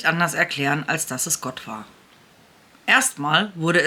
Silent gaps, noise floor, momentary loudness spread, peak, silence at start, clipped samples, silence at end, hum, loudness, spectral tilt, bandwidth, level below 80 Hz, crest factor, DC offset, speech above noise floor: none; -53 dBFS; 15 LU; -2 dBFS; 0 s; under 0.1%; 0 s; none; -21 LUFS; -2.5 dB/octave; 19 kHz; -66 dBFS; 20 dB; under 0.1%; 31 dB